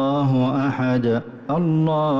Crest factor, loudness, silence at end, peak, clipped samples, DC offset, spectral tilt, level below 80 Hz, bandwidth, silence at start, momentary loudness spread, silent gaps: 8 dB; -21 LUFS; 0 s; -12 dBFS; under 0.1%; under 0.1%; -9.5 dB/octave; -54 dBFS; 7 kHz; 0 s; 5 LU; none